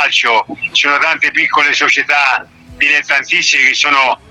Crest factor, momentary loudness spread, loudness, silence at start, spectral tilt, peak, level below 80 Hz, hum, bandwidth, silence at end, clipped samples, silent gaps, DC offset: 12 dB; 5 LU; -10 LUFS; 0 s; 0 dB/octave; 0 dBFS; -52 dBFS; none; 12.5 kHz; 0.15 s; under 0.1%; none; under 0.1%